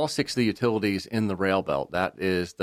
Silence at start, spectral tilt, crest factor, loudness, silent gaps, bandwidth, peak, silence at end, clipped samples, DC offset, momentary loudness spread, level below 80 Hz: 0 s; -5.5 dB/octave; 18 dB; -26 LUFS; none; 15.5 kHz; -8 dBFS; 0 s; under 0.1%; under 0.1%; 3 LU; -58 dBFS